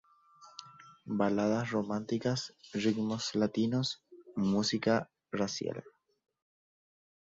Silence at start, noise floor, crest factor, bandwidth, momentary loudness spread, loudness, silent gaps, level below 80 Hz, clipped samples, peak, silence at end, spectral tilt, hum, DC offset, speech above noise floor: 0.4 s; -60 dBFS; 18 dB; 7.8 kHz; 16 LU; -33 LUFS; none; -68 dBFS; under 0.1%; -16 dBFS; 1.5 s; -5.5 dB/octave; none; under 0.1%; 28 dB